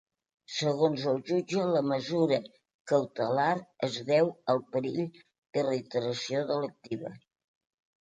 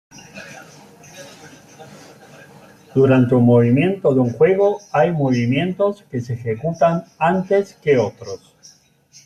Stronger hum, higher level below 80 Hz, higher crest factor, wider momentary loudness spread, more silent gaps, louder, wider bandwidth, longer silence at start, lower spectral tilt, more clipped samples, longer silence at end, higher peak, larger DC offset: neither; second, -76 dBFS vs -56 dBFS; about the same, 18 dB vs 16 dB; second, 9 LU vs 23 LU; first, 2.74-2.85 s, 5.38-5.42 s vs none; second, -30 LUFS vs -17 LUFS; second, 9.2 kHz vs 11.5 kHz; first, 0.5 s vs 0.35 s; second, -5.5 dB/octave vs -8 dB/octave; neither; about the same, 0.85 s vs 0.9 s; second, -12 dBFS vs -4 dBFS; neither